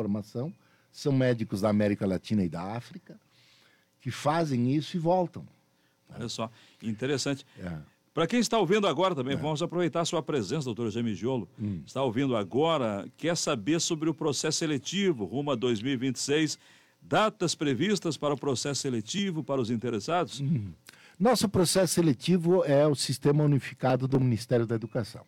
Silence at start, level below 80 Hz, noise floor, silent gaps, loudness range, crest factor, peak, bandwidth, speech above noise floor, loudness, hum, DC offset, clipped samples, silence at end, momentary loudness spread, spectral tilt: 0 s; -66 dBFS; -68 dBFS; none; 6 LU; 16 dB; -14 dBFS; 17 kHz; 40 dB; -28 LUFS; none; under 0.1%; under 0.1%; 0.05 s; 12 LU; -5 dB/octave